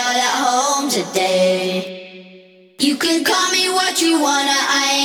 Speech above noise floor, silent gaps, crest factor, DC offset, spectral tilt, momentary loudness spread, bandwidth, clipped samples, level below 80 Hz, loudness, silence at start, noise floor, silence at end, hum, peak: 28 dB; none; 14 dB; under 0.1%; -2 dB/octave; 5 LU; 20 kHz; under 0.1%; -64 dBFS; -16 LUFS; 0 s; -45 dBFS; 0 s; none; -2 dBFS